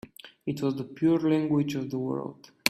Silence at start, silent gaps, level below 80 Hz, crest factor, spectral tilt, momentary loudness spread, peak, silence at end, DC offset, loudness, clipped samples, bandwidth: 0.25 s; none; -68 dBFS; 28 dB; -5.5 dB/octave; 13 LU; 0 dBFS; 0 s; under 0.1%; -28 LUFS; under 0.1%; 15.5 kHz